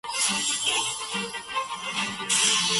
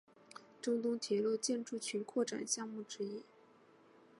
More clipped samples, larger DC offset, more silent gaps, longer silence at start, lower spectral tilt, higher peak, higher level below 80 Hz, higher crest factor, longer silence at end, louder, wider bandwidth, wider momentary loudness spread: neither; neither; neither; second, 0.05 s vs 0.35 s; second, 0 dB/octave vs -3 dB/octave; first, -10 dBFS vs -22 dBFS; first, -64 dBFS vs under -90 dBFS; about the same, 18 dB vs 18 dB; second, 0 s vs 1 s; first, -25 LUFS vs -39 LUFS; about the same, 12 kHz vs 11.5 kHz; second, 10 LU vs 15 LU